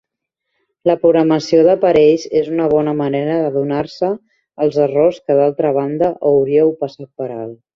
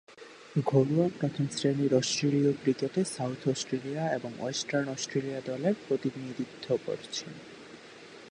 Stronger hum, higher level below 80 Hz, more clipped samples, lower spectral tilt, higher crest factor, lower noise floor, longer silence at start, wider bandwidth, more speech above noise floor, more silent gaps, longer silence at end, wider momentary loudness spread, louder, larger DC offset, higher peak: neither; first, -54 dBFS vs -72 dBFS; neither; first, -7 dB/octave vs -5.5 dB/octave; about the same, 14 dB vs 18 dB; first, -78 dBFS vs -49 dBFS; first, 0.85 s vs 0.1 s; second, 7.2 kHz vs 11 kHz; first, 63 dB vs 20 dB; neither; first, 0.2 s vs 0 s; second, 13 LU vs 20 LU; first, -15 LUFS vs -30 LUFS; neither; first, 0 dBFS vs -12 dBFS